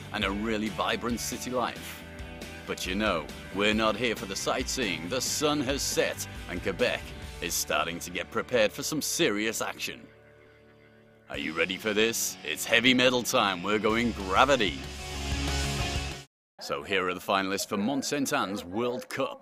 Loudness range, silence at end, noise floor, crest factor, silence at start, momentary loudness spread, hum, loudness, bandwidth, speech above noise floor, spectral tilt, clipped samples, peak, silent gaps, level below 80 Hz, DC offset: 6 LU; 0.05 s; -57 dBFS; 24 dB; 0 s; 12 LU; none; -28 LUFS; 15.5 kHz; 28 dB; -3 dB/octave; under 0.1%; -6 dBFS; 16.27-16.58 s; -46 dBFS; under 0.1%